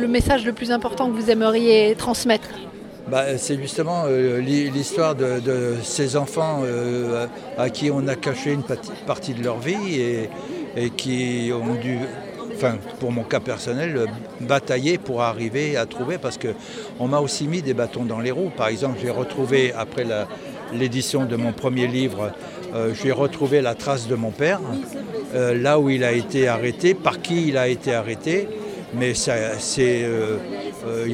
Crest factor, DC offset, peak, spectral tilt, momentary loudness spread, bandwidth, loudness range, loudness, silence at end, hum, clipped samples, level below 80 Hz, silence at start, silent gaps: 20 dB; under 0.1%; -2 dBFS; -5 dB/octave; 10 LU; 16 kHz; 5 LU; -22 LUFS; 0 s; none; under 0.1%; -48 dBFS; 0 s; none